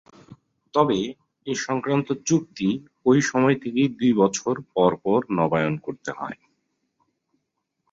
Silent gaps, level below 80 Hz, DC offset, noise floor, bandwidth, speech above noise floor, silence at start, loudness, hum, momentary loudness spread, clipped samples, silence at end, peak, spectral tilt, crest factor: none; -62 dBFS; under 0.1%; -78 dBFS; 7.8 kHz; 56 dB; 0.3 s; -23 LUFS; none; 12 LU; under 0.1%; 1.6 s; -4 dBFS; -5.5 dB/octave; 20 dB